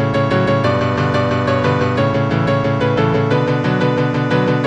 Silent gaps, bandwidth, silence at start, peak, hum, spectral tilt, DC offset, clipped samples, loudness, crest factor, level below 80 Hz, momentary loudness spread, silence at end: none; 8.6 kHz; 0 s; -2 dBFS; none; -7.5 dB/octave; under 0.1%; under 0.1%; -16 LUFS; 14 dB; -44 dBFS; 1 LU; 0 s